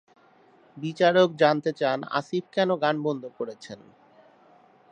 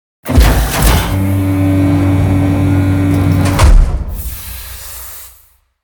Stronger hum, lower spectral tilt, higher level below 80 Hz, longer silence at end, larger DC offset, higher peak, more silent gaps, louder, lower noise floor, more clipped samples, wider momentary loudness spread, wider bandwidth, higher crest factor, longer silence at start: neither; about the same, -6 dB/octave vs -6 dB/octave; second, -78 dBFS vs -16 dBFS; first, 1.15 s vs 0.55 s; neither; second, -6 dBFS vs 0 dBFS; neither; second, -25 LUFS vs -12 LUFS; first, -58 dBFS vs -48 dBFS; second, under 0.1% vs 0.4%; about the same, 16 LU vs 15 LU; second, 9.2 kHz vs over 20 kHz; first, 20 dB vs 12 dB; first, 0.75 s vs 0.25 s